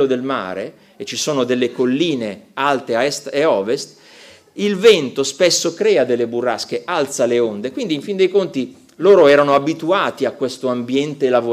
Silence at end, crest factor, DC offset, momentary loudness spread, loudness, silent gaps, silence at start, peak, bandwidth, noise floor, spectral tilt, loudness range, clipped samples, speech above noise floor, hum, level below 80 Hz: 0 s; 16 dB; under 0.1%; 12 LU; -17 LUFS; none; 0 s; -2 dBFS; 15.5 kHz; -44 dBFS; -4 dB/octave; 4 LU; under 0.1%; 27 dB; none; -64 dBFS